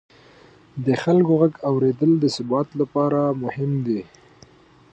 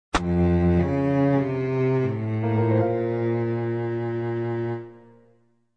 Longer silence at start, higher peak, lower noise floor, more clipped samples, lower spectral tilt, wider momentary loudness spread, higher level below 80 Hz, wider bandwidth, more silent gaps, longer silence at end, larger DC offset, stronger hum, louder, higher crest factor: first, 0.75 s vs 0.15 s; first, -6 dBFS vs -10 dBFS; second, -51 dBFS vs -62 dBFS; neither; about the same, -8 dB/octave vs -8.5 dB/octave; about the same, 8 LU vs 7 LU; second, -62 dBFS vs -44 dBFS; about the same, 8.6 kHz vs 9.4 kHz; neither; about the same, 0.9 s vs 0.8 s; neither; neither; first, -21 LUFS vs -24 LUFS; about the same, 16 dB vs 14 dB